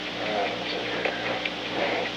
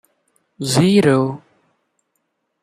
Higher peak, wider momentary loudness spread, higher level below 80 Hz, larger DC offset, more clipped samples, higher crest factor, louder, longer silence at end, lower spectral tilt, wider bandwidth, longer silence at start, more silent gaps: second, -12 dBFS vs -2 dBFS; second, 2 LU vs 15 LU; about the same, -58 dBFS vs -58 dBFS; neither; neither; about the same, 16 dB vs 18 dB; second, -28 LUFS vs -16 LUFS; second, 0 s vs 1.25 s; second, -4 dB/octave vs -5.5 dB/octave; first, 19.5 kHz vs 14.5 kHz; second, 0 s vs 0.6 s; neither